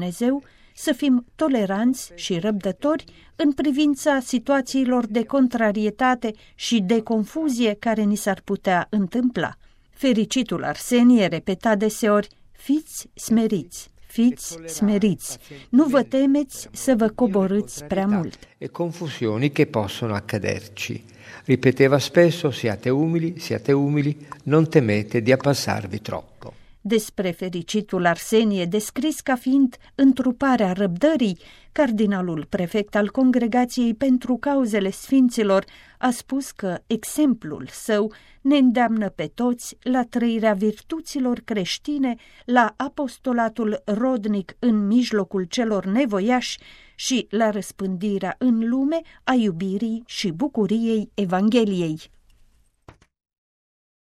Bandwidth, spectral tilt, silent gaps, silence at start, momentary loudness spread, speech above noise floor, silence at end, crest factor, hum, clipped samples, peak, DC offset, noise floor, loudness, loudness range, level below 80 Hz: 15 kHz; -5.5 dB/octave; none; 0 s; 10 LU; 36 dB; 2.05 s; 20 dB; none; under 0.1%; 0 dBFS; under 0.1%; -57 dBFS; -22 LUFS; 3 LU; -54 dBFS